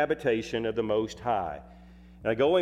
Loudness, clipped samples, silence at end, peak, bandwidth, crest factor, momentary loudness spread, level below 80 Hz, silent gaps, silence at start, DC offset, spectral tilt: -29 LUFS; under 0.1%; 0 s; -14 dBFS; 11.5 kHz; 16 dB; 9 LU; -54 dBFS; none; 0 s; under 0.1%; -6 dB/octave